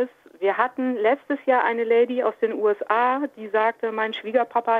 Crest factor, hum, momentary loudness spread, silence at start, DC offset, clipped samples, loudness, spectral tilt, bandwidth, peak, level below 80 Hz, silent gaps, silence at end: 18 dB; none; 6 LU; 0 s; under 0.1%; under 0.1%; -23 LUFS; -6 dB/octave; 4.7 kHz; -4 dBFS; -78 dBFS; none; 0 s